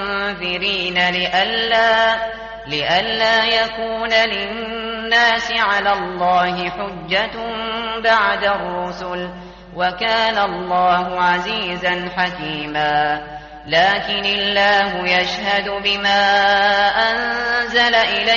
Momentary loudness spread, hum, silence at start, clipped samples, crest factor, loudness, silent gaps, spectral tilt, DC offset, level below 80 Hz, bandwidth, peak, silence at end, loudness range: 11 LU; none; 0 s; under 0.1%; 16 dB; -17 LUFS; none; 0 dB/octave; under 0.1%; -46 dBFS; 7.2 kHz; -2 dBFS; 0 s; 4 LU